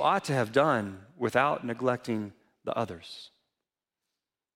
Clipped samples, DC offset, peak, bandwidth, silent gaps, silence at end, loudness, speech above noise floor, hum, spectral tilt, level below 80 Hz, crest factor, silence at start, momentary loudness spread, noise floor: under 0.1%; under 0.1%; -10 dBFS; 16 kHz; none; 1.3 s; -29 LUFS; 60 dB; none; -5.5 dB/octave; -72 dBFS; 20 dB; 0 s; 17 LU; -89 dBFS